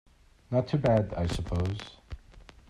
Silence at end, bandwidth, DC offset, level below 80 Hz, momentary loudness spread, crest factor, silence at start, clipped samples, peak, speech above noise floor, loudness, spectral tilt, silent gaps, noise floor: 0.3 s; 12 kHz; under 0.1%; -44 dBFS; 22 LU; 18 dB; 0.5 s; under 0.1%; -12 dBFS; 25 dB; -29 LUFS; -7.5 dB/octave; none; -53 dBFS